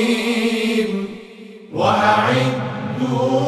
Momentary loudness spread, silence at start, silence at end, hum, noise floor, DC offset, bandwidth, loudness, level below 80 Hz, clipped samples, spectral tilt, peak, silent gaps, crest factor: 16 LU; 0 s; 0 s; none; -38 dBFS; under 0.1%; 14.5 kHz; -18 LUFS; -58 dBFS; under 0.1%; -5.5 dB/octave; -2 dBFS; none; 16 dB